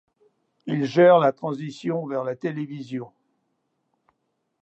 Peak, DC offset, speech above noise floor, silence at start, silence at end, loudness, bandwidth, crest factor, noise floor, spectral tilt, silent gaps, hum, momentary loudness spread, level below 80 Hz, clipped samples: -6 dBFS; under 0.1%; 53 dB; 0.65 s; 1.55 s; -22 LUFS; 8 kHz; 20 dB; -75 dBFS; -7.5 dB/octave; none; none; 18 LU; -78 dBFS; under 0.1%